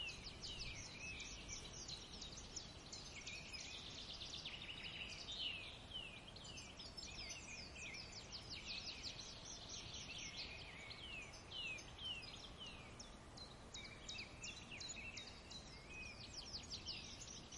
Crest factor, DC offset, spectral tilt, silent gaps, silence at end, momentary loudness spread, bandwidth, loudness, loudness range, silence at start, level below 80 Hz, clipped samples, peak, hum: 18 dB; under 0.1%; -2 dB/octave; none; 0 s; 6 LU; 11.5 kHz; -51 LUFS; 3 LU; 0 s; -64 dBFS; under 0.1%; -36 dBFS; none